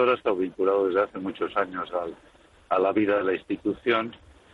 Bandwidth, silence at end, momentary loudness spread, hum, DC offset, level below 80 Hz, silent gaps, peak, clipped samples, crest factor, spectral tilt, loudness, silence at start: 5.4 kHz; 0.4 s; 9 LU; none; under 0.1%; -62 dBFS; none; -10 dBFS; under 0.1%; 16 dB; -7 dB/octave; -26 LUFS; 0 s